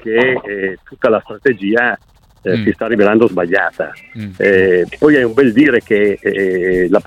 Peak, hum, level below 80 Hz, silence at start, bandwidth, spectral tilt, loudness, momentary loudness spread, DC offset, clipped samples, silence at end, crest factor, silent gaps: 0 dBFS; none; -46 dBFS; 0.05 s; 11 kHz; -7.5 dB/octave; -13 LUFS; 11 LU; under 0.1%; under 0.1%; 0.05 s; 14 dB; none